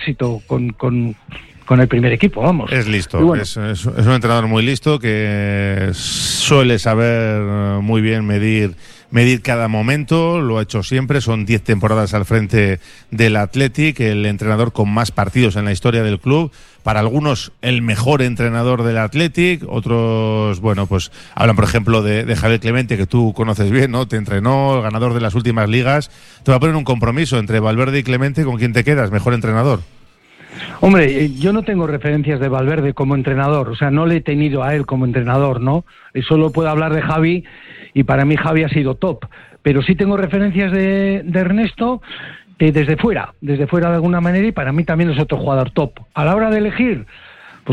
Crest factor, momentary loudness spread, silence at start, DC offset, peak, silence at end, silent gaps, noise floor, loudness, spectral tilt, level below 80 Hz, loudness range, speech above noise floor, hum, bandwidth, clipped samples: 14 dB; 6 LU; 0 s; under 0.1%; 0 dBFS; 0 s; none; -44 dBFS; -16 LUFS; -6.5 dB/octave; -38 dBFS; 1 LU; 29 dB; none; 12.5 kHz; under 0.1%